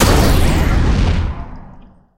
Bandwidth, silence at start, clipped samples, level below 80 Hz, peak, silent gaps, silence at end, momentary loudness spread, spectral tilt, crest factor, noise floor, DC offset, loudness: 16 kHz; 0 s; under 0.1%; -16 dBFS; 0 dBFS; none; 0.4 s; 16 LU; -5.5 dB/octave; 14 dB; -40 dBFS; under 0.1%; -15 LUFS